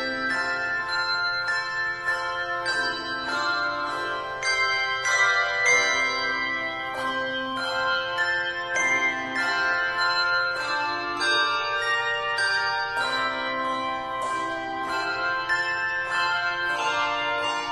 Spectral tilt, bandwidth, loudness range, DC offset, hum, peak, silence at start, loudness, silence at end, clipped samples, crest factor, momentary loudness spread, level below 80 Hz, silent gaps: -1 dB/octave; 15.5 kHz; 3 LU; under 0.1%; none; -8 dBFS; 0 s; -24 LUFS; 0 s; under 0.1%; 18 dB; 7 LU; -60 dBFS; none